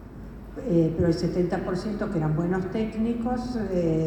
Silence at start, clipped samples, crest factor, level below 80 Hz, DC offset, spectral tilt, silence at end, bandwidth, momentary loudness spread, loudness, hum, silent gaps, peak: 0 s; under 0.1%; 16 dB; -42 dBFS; under 0.1%; -8.5 dB/octave; 0 s; 10 kHz; 8 LU; -26 LUFS; none; none; -10 dBFS